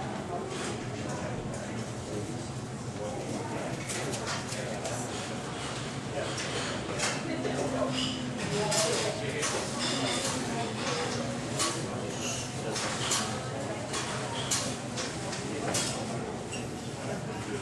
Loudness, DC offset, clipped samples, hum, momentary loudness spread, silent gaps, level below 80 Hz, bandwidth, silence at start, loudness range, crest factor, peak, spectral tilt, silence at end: -32 LUFS; under 0.1%; under 0.1%; none; 7 LU; none; -54 dBFS; 13.5 kHz; 0 s; 5 LU; 20 dB; -14 dBFS; -3.5 dB/octave; 0 s